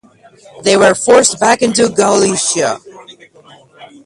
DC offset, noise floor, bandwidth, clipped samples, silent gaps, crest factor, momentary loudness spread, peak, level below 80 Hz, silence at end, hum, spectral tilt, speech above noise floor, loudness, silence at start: under 0.1%; -43 dBFS; 11.5 kHz; under 0.1%; none; 14 dB; 9 LU; 0 dBFS; -52 dBFS; 0.2 s; none; -2.5 dB/octave; 31 dB; -11 LUFS; 0.55 s